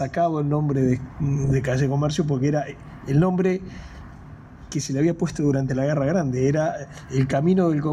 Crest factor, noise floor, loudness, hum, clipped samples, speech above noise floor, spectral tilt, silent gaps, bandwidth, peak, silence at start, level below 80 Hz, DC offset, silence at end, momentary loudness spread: 14 dB; -42 dBFS; -23 LUFS; none; under 0.1%; 20 dB; -7.5 dB/octave; none; 10.5 kHz; -10 dBFS; 0 s; -46 dBFS; under 0.1%; 0 s; 14 LU